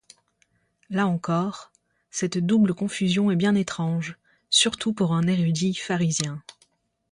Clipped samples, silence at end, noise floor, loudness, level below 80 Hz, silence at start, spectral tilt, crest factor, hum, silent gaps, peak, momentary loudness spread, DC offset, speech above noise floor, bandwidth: under 0.1%; 0.6 s; -68 dBFS; -24 LUFS; -62 dBFS; 0.9 s; -4.5 dB/octave; 18 dB; none; none; -6 dBFS; 10 LU; under 0.1%; 45 dB; 11 kHz